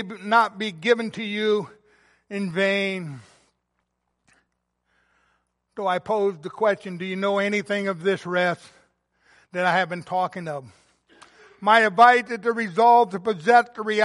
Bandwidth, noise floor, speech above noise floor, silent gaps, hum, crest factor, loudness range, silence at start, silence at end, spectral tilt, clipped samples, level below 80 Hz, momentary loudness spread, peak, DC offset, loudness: 11.5 kHz; -76 dBFS; 54 dB; none; none; 20 dB; 10 LU; 0 s; 0 s; -5 dB/octave; under 0.1%; -72 dBFS; 16 LU; -2 dBFS; under 0.1%; -22 LUFS